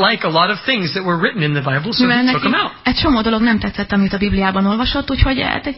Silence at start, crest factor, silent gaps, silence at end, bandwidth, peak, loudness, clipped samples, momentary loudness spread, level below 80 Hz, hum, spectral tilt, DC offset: 0 s; 16 dB; none; 0 s; 5.8 kHz; 0 dBFS; -16 LUFS; under 0.1%; 4 LU; -30 dBFS; none; -9.5 dB/octave; 0.1%